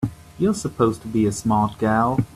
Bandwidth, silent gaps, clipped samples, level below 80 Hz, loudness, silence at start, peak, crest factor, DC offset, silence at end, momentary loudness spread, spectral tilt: 13.5 kHz; none; under 0.1%; -46 dBFS; -21 LUFS; 0 s; -6 dBFS; 14 dB; under 0.1%; 0.05 s; 3 LU; -6.5 dB/octave